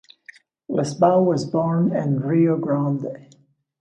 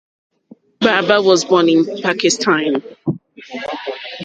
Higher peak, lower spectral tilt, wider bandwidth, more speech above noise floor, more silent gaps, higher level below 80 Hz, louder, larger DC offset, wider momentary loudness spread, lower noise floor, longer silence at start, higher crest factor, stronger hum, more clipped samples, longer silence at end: second, -4 dBFS vs 0 dBFS; first, -8 dB/octave vs -4 dB/octave; about the same, 9.6 kHz vs 9.4 kHz; about the same, 29 dB vs 32 dB; neither; about the same, -66 dBFS vs -62 dBFS; second, -20 LUFS vs -15 LUFS; neither; second, 10 LU vs 14 LU; about the same, -49 dBFS vs -47 dBFS; about the same, 0.7 s vs 0.8 s; about the same, 16 dB vs 16 dB; neither; neither; first, 0.6 s vs 0 s